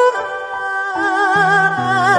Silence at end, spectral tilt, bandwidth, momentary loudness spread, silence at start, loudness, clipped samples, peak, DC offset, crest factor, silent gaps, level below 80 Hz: 0 s; -4.5 dB/octave; 11.5 kHz; 10 LU; 0 s; -16 LUFS; under 0.1%; -2 dBFS; under 0.1%; 14 dB; none; -58 dBFS